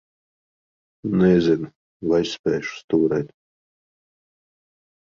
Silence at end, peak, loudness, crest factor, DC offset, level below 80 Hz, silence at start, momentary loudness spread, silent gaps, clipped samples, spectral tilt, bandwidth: 1.75 s; -6 dBFS; -21 LUFS; 18 dB; under 0.1%; -54 dBFS; 1.05 s; 15 LU; 1.76-2.00 s, 2.39-2.44 s, 2.84-2.88 s; under 0.1%; -7 dB/octave; 7.6 kHz